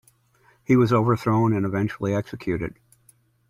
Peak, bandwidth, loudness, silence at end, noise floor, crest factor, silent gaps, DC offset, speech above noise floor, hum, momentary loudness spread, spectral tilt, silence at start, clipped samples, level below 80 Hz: -6 dBFS; 13.5 kHz; -23 LUFS; 0.8 s; -60 dBFS; 18 dB; none; under 0.1%; 39 dB; none; 10 LU; -8.5 dB/octave; 0.7 s; under 0.1%; -54 dBFS